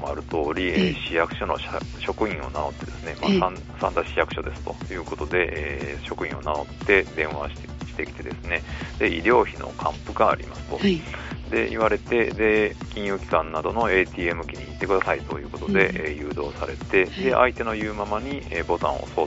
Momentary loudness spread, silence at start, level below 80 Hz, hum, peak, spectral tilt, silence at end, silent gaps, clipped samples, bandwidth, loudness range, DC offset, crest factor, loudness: 12 LU; 0 s; -40 dBFS; 60 Hz at -40 dBFS; -2 dBFS; -4 dB/octave; 0 s; none; under 0.1%; 8 kHz; 3 LU; under 0.1%; 24 dB; -25 LUFS